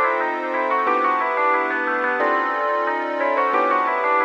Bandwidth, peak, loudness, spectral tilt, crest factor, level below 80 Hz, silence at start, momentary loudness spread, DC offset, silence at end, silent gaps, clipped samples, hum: 8 kHz; -6 dBFS; -20 LUFS; -3.5 dB/octave; 14 dB; -74 dBFS; 0 s; 3 LU; under 0.1%; 0 s; none; under 0.1%; none